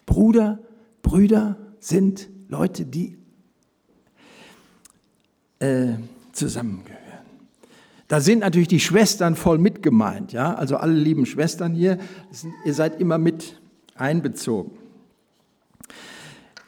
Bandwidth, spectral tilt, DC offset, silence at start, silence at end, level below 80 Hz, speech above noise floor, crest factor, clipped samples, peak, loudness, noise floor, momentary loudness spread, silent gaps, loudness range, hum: 19 kHz; -6 dB/octave; under 0.1%; 0.05 s; 0.35 s; -42 dBFS; 46 dB; 18 dB; under 0.1%; -4 dBFS; -21 LUFS; -66 dBFS; 20 LU; none; 11 LU; none